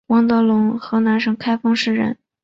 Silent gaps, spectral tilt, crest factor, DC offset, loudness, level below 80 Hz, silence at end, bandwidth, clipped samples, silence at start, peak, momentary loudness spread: none; -6 dB/octave; 12 dB; under 0.1%; -18 LUFS; -60 dBFS; 0.3 s; 7.6 kHz; under 0.1%; 0.1 s; -4 dBFS; 5 LU